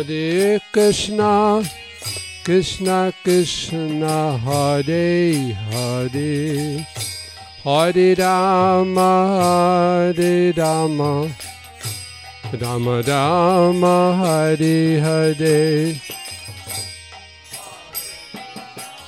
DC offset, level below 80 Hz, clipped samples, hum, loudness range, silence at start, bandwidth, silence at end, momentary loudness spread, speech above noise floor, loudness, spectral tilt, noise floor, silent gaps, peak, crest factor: under 0.1%; -50 dBFS; under 0.1%; none; 5 LU; 0 s; 16.5 kHz; 0 s; 16 LU; 23 dB; -18 LUFS; -5.5 dB/octave; -40 dBFS; none; -4 dBFS; 14 dB